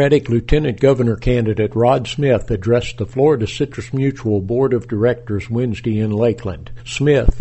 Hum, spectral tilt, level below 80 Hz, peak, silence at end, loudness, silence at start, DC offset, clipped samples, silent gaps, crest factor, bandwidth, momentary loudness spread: none; -7 dB/octave; -28 dBFS; 0 dBFS; 0 s; -17 LUFS; 0 s; under 0.1%; under 0.1%; none; 16 dB; 8.4 kHz; 7 LU